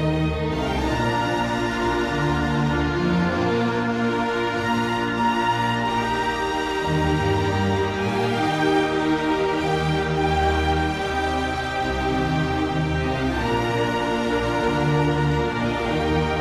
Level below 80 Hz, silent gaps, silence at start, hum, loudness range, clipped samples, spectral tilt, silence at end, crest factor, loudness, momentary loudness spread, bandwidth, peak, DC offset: -36 dBFS; none; 0 s; none; 1 LU; under 0.1%; -6 dB/octave; 0 s; 12 dB; -22 LUFS; 3 LU; 14 kHz; -8 dBFS; under 0.1%